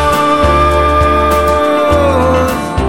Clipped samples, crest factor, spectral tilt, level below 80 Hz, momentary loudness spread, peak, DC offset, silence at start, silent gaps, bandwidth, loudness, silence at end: under 0.1%; 10 dB; -6 dB/octave; -20 dBFS; 2 LU; 0 dBFS; 2%; 0 s; none; 17 kHz; -10 LUFS; 0 s